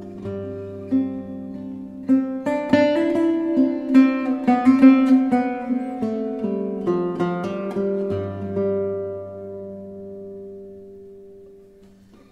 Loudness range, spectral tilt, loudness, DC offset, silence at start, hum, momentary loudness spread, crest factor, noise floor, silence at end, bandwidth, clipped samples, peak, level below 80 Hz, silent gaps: 12 LU; -8 dB/octave; -20 LUFS; under 0.1%; 0 s; none; 20 LU; 20 dB; -49 dBFS; 0.75 s; 7.2 kHz; under 0.1%; -2 dBFS; -60 dBFS; none